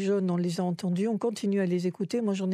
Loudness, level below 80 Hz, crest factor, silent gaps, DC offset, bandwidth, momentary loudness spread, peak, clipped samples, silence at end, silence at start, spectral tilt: -29 LUFS; -80 dBFS; 12 dB; none; under 0.1%; 12.5 kHz; 3 LU; -16 dBFS; under 0.1%; 0 s; 0 s; -7 dB/octave